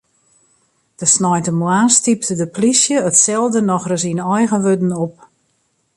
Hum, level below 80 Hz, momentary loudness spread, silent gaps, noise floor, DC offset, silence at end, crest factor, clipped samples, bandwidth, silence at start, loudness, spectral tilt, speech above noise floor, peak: none; -60 dBFS; 7 LU; none; -64 dBFS; under 0.1%; 0.85 s; 16 dB; under 0.1%; 11.5 kHz; 1 s; -14 LUFS; -4 dB/octave; 49 dB; 0 dBFS